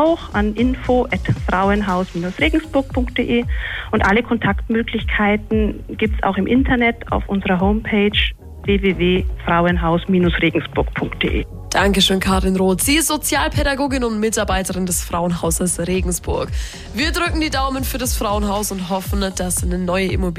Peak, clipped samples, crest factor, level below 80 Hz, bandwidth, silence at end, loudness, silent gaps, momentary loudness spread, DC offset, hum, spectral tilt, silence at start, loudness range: -4 dBFS; under 0.1%; 14 dB; -28 dBFS; 15.5 kHz; 0 s; -18 LUFS; none; 6 LU; under 0.1%; none; -4.5 dB/octave; 0 s; 3 LU